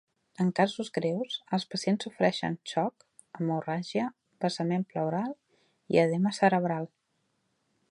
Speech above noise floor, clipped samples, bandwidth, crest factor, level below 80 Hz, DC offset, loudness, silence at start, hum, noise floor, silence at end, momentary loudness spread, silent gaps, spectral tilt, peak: 47 dB; under 0.1%; 11 kHz; 22 dB; -76 dBFS; under 0.1%; -30 LUFS; 0.4 s; none; -76 dBFS; 1.05 s; 9 LU; none; -6 dB/octave; -8 dBFS